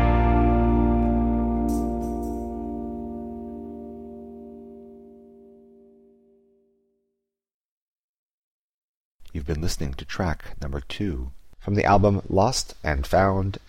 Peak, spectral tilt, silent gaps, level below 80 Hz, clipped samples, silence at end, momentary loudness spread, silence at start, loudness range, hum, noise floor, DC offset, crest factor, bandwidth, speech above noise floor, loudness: -8 dBFS; -6.5 dB/octave; 7.54-9.19 s; -32 dBFS; under 0.1%; 0.1 s; 20 LU; 0 s; 21 LU; 60 Hz at -65 dBFS; -80 dBFS; under 0.1%; 18 dB; 15.5 kHz; 57 dB; -24 LUFS